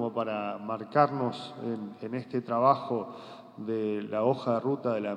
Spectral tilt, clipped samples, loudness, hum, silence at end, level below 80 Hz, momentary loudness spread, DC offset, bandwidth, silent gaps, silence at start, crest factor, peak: -8 dB/octave; under 0.1%; -30 LUFS; none; 0 s; -86 dBFS; 12 LU; under 0.1%; 9.8 kHz; none; 0 s; 22 dB; -8 dBFS